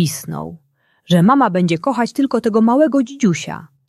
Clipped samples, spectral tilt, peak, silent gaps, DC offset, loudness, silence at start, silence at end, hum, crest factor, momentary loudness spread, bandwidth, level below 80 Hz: under 0.1%; -6 dB/octave; -2 dBFS; none; under 0.1%; -16 LUFS; 0 s; 0.25 s; none; 14 dB; 15 LU; 13.5 kHz; -58 dBFS